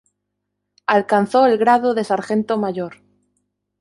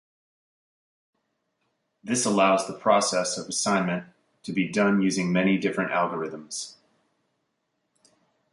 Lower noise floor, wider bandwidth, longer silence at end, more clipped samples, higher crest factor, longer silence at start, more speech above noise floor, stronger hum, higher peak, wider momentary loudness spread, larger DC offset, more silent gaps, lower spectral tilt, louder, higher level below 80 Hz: about the same, -77 dBFS vs -77 dBFS; about the same, 11.5 kHz vs 11.5 kHz; second, 0.85 s vs 1.8 s; neither; about the same, 16 dB vs 20 dB; second, 0.9 s vs 2.05 s; first, 60 dB vs 52 dB; first, 50 Hz at -45 dBFS vs none; first, -2 dBFS vs -6 dBFS; about the same, 12 LU vs 13 LU; neither; neither; first, -6 dB/octave vs -4 dB/octave; first, -18 LUFS vs -25 LUFS; about the same, -66 dBFS vs -70 dBFS